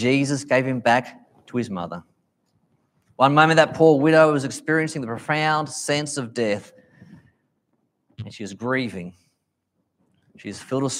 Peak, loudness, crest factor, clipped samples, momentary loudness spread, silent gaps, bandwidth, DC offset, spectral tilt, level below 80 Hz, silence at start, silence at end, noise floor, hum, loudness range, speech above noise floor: -2 dBFS; -21 LUFS; 22 dB; under 0.1%; 21 LU; none; 15 kHz; under 0.1%; -5 dB/octave; -68 dBFS; 0 s; 0 s; -74 dBFS; none; 14 LU; 54 dB